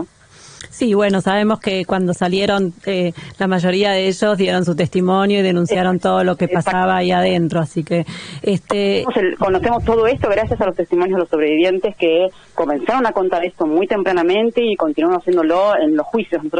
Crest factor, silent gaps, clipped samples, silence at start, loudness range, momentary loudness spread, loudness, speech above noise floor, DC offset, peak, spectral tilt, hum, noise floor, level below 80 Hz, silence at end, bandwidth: 14 dB; none; under 0.1%; 0 s; 2 LU; 5 LU; -17 LUFS; 27 dB; under 0.1%; -4 dBFS; -6 dB/octave; none; -44 dBFS; -44 dBFS; 0 s; 10 kHz